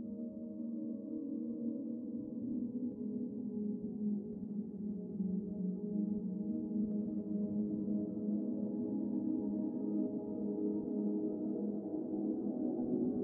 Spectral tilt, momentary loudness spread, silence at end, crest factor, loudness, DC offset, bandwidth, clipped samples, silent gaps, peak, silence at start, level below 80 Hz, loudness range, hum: -14.5 dB/octave; 5 LU; 0 s; 14 dB; -39 LUFS; under 0.1%; 1.4 kHz; under 0.1%; none; -24 dBFS; 0 s; -74 dBFS; 3 LU; none